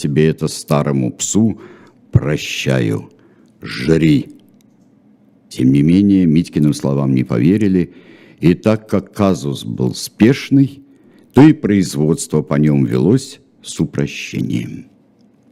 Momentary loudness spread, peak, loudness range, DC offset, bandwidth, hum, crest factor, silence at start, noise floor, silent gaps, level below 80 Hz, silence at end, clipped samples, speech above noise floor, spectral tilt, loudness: 12 LU; 0 dBFS; 4 LU; under 0.1%; 15.5 kHz; none; 16 dB; 0 s; -51 dBFS; none; -46 dBFS; 0.7 s; 0.1%; 37 dB; -6.5 dB/octave; -15 LUFS